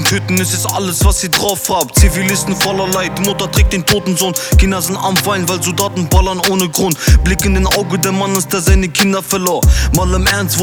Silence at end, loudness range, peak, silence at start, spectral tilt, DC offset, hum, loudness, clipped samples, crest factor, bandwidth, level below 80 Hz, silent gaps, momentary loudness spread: 0 s; 1 LU; 0 dBFS; 0 s; -4 dB/octave; under 0.1%; none; -13 LUFS; under 0.1%; 12 dB; over 20 kHz; -18 dBFS; none; 4 LU